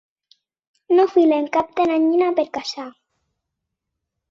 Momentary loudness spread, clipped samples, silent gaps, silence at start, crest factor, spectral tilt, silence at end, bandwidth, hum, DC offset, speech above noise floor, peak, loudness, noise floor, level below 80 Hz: 14 LU; under 0.1%; none; 0.9 s; 16 dB; -4.5 dB/octave; 1.4 s; 7.4 kHz; none; under 0.1%; 62 dB; -6 dBFS; -18 LUFS; -80 dBFS; -64 dBFS